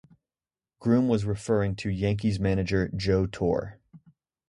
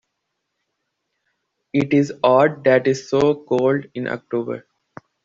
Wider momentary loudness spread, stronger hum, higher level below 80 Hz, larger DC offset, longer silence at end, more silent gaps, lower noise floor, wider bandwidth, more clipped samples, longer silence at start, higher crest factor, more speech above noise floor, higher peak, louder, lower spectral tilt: second, 5 LU vs 12 LU; neither; first, -44 dBFS vs -60 dBFS; neither; about the same, 0.55 s vs 0.65 s; neither; first, under -90 dBFS vs -77 dBFS; first, 11 kHz vs 7.8 kHz; neither; second, 0.8 s vs 1.75 s; about the same, 18 dB vs 18 dB; first, over 65 dB vs 58 dB; second, -10 dBFS vs -4 dBFS; second, -27 LUFS vs -19 LUFS; about the same, -7.5 dB/octave vs -6.5 dB/octave